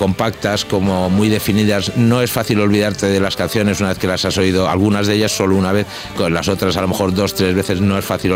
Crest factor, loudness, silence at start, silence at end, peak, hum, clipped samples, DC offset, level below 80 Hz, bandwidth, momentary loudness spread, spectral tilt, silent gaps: 14 dB; -16 LUFS; 0 s; 0 s; -2 dBFS; none; under 0.1%; under 0.1%; -42 dBFS; 16.5 kHz; 3 LU; -5 dB/octave; none